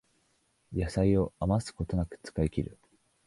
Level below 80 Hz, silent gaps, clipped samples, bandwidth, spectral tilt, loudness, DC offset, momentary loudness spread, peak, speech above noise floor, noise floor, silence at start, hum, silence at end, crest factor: -44 dBFS; none; under 0.1%; 11.5 kHz; -7.5 dB/octave; -31 LUFS; under 0.1%; 10 LU; -14 dBFS; 42 dB; -72 dBFS; 0.7 s; none; 0.55 s; 18 dB